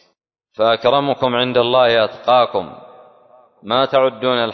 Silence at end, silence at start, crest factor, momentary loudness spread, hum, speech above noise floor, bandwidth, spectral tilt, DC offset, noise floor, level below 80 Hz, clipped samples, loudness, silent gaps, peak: 0 s; 0.6 s; 16 dB; 6 LU; none; 50 dB; 6.2 kHz; -6.5 dB/octave; under 0.1%; -65 dBFS; -60 dBFS; under 0.1%; -16 LUFS; none; -2 dBFS